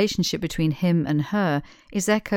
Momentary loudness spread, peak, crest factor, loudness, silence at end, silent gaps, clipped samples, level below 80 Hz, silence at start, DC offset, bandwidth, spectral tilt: 6 LU; -6 dBFS; 18 dB; -24 LUFS; 0 s; none; under 0.1%; -48 dBFS; 0 s; under 0.1%; 17.5 kHz; -5.5 dB/octave